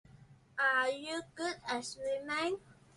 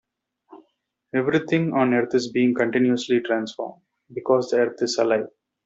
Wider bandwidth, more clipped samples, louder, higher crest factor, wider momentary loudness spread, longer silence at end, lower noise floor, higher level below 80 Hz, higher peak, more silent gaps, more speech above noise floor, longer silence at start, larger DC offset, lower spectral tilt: first, 11.5 kHz vs 8 kHz; neither; second, -35 LUFS vs -22 LUFS; about the same, 18 dB vs 18 dB; about the same, 11 LU vs 11 LU; about the same, 0.25 s vs 0.35 s; second, -60 dBFS vs -70 dBFS; about the same, -72 dBFS vs -68 dBFS; second, -20 dBFS vs -6 dBFS; neither; second, 24 dB vs 49 dB; second, 0.1 s vs 0.5 s; neither; second, -2.5 dB/octave vs -5.5 dB/octave